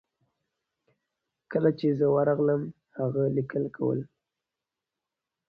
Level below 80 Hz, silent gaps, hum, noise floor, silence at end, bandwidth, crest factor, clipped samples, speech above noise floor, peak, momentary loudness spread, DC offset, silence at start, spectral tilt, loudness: -68 dBFS; none; none; -88 dBFS; 1.45 s; 5.2 kHz; 20 dB; under 0.1%; 63 dB; -10 dBFS; 9 LU; under 0.1%; 1.5 s; -11 dB/octave; -27 LUFS